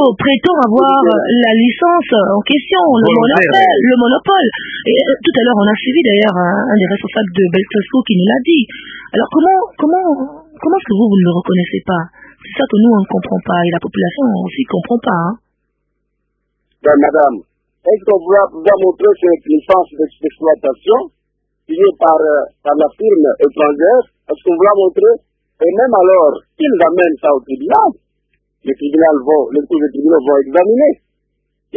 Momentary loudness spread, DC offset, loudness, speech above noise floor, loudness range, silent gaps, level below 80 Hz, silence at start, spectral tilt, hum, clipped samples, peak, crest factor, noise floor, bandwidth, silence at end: 8 LU; under 0.1%; -12 LUFS; 57 dB; 4 LU; none; -54 dBFS; 0 s; -8.5 dB/octave; none; under 0.1%; 0 dBFS; 12 dB; -68 dBFS; 4.8 kHz; 0 s